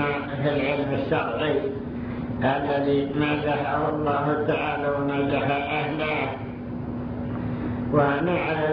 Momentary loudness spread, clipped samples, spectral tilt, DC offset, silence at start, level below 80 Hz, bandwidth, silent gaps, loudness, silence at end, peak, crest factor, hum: 8 LU; under 0.1%; -9.5 dB/octave; under 0.1%; 0 s; -46 dBFS; 5.4 kHz; none; -25 LUFS; 0 s; -6 dBFS; 18 dB; none